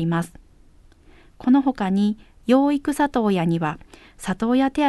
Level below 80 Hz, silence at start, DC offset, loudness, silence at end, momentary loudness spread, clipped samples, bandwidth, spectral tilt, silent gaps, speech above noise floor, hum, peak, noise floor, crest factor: -50 dBFS; 0 s; under 0.1%; -21 LUFS; 0 s; 12 LU; under 0.1%; 12.5 kHz; -7 dB/octave; none; 30 dB; none; -4 dBFS; -51 dBFS; 18 dB